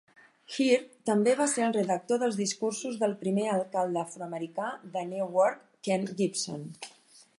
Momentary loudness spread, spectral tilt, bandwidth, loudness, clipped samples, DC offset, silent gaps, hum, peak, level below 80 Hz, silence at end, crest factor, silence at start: 11 LU; -4.5 dB/octave; 11.5 kHz; -29 LUFS; under 0.1%; under 0.1%; none; none; -12 dBFS; -82 dBFS; 0.5 s; 18 dB; 0.5 s